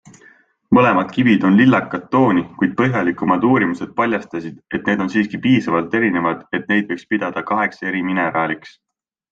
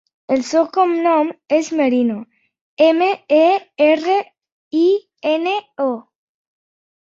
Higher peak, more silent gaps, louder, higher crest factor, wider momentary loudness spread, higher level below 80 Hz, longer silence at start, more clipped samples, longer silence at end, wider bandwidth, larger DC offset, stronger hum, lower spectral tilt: about the same, -2 dBFS vs -2 dBFS; second, none vs 2.61-2.77 s, 4.52-4.71 s; about the same, -17 LUFS vs -17 LUFS; about the same, 16 dB vs 16 dB; about the same, 9 LU vs 8 LU; first, -56 dBFS vs -68 dBFS; first, 0.7 s vs 0.3 s; neither; second, 0.65 s vs 1 s; about the same, 7.4 kHz vs 7.8 kHz; neither; neither; first, -7.5 dB/octave vs -4 dB/octave